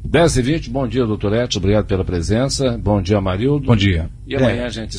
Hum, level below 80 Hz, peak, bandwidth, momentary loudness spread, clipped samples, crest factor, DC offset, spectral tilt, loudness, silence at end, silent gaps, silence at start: none; -30 dBFS; -4 dBFS; 10.5 kHz; 5 LU; under 0.1%; 14 dB; under 0.1%; -6 dB/octave; -18 LUFS; 0 s; none; 0 s